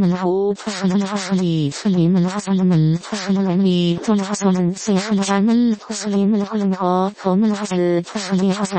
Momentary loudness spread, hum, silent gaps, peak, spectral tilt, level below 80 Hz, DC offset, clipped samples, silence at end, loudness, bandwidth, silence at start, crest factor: 4 LU; none; none; -4 dBFS; -6.5 dB/octave; -56 dBFS; under 0.1%; under 0.1%; 0 s; -18 LUFS; 8.8 kHz; 0 s; 14 dB